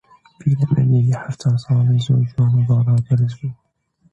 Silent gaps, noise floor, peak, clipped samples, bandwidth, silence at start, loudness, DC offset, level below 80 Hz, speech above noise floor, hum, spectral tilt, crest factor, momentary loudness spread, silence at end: none; -61 dBFS; -4 dBFS; under 0.1%; 7.8 kHz; 0.45 s; -17 LUFS; under 0.1%; -50 dBFS; 45 dB; none; -8.5 dB/octave; 12 dB; 7 LU; 0.6 s